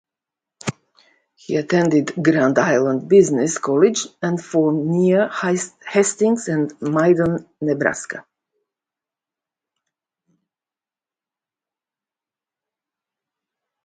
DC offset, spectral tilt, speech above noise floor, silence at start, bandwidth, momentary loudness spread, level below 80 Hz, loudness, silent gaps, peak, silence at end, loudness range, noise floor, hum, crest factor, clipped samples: under 0.1%; -5.5 dB/octave; over 72 dB; 0.65 s; 9.6 kHz; 9 LU; -60 dBFS; -18 LUFS; none; -2 dBFS; 5.65 s; 8 LU; under -90 dBFS; none; 20 dB; under 0.1%